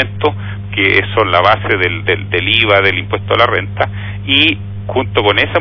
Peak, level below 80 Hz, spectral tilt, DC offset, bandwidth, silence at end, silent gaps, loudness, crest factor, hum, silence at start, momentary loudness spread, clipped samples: 0 dBFS; -38 dBFS; -7 dB/octave; under 0.1%; 5.4 kHz; 0 s; none; -12 LUFS; 14 dB; 50 Hz at -25 dBFS; 0 s; 9 LU; 0.3%